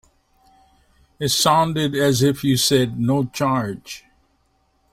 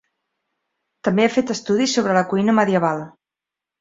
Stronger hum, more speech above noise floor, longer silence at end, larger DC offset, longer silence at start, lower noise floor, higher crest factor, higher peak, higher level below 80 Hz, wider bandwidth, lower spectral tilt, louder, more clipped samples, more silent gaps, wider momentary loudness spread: neither; second, 45 dB vs 69 dB; first, 0.95 s vs 0.7 s; neither; first, 1.2 s vs 1.05 s; second, -64 dBFS vs -87 dBFS; about the same, 18 dB vs 18 dB; about the same, -4 dBFS vs -2 dBFS; first, -52 dBFS vs -62 dBFS; first, 16.5 kHz vs 7.8 kHz; about the same, -4.5 dB/octave vs -5 dB/octave; about the same, -19 LUFS vs -19 LUFS; neither; neither; first, 13 LU vs 8 LU